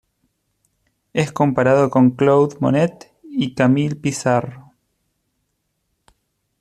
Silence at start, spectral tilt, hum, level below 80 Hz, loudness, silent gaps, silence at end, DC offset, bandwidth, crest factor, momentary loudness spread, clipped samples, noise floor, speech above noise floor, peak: 1.15 s; -6.5 dB/octave; none; -58 dBFS; -18 LUFS; none; 2 s; under 0.1%; 12.5 kHz; 16 dB; 9 LU; under 0.1%; -72 dBFS; 55 dB; -2 dBFS